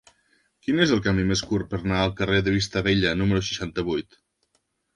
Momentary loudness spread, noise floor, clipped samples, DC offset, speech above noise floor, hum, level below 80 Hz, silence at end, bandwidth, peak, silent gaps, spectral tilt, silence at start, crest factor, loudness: 7 LU; -72 dBFS; under 0.1%; under 0.1%; 49 dB; none; -42 dBFS; 0.95 s; 11 kHz; -4 dBFS; none; -5.5 dB/octave; 0.7 s; 20 dB; -24 LUFS